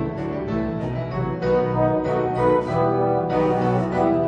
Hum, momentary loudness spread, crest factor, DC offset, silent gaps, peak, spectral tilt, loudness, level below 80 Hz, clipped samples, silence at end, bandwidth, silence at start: none; 6 LU; 14 dB; under 0.1%; none; -6 dBFS; -9 dB/octave; -22 LUFS; -42 dBFS; under 0.1%; 0 s; 8.8 kHz; 0 s